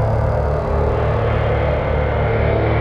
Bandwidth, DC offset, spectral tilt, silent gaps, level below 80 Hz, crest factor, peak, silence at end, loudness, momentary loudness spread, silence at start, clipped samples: 5.6 kHz; under 0.1%; -9 dB/octave; none; -22 dBFS; 12 dB; -4 dBFS; 0 s; -18 LUFS; 2 LU; 0 s; under 0.1%